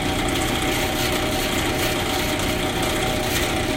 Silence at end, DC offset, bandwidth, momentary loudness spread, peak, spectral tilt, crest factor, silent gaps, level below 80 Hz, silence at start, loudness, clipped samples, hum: 0 s; under 0.1%; 16.5 kHz; 1 LU; -8 dBFS; -3.5 dB/octave; 14 dB; none; -34 dBFS; 0 s; -21 LUFS; under 0.1%; 60 Hz at -35 dBFS